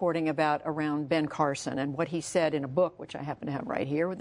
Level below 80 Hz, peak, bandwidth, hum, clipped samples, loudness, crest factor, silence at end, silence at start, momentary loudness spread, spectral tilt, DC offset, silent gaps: -66 dBFS; -12 dBFS; 11 kHz; none; under 0.1%; -30 LUFS; 18 dB; 0 s; 0 s; 7 LU; -5.5 dB/octave; under 0.1%; none